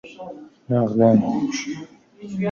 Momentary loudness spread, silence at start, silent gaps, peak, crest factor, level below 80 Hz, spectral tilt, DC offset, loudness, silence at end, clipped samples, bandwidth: 22 LU; 0.05 s; none; -4 dBFS; 18 dB; -60 dBFS; -7 dB/octave; under 0.1%; -20 LUFS; 0 s; under 0.1%; 7.2 kHz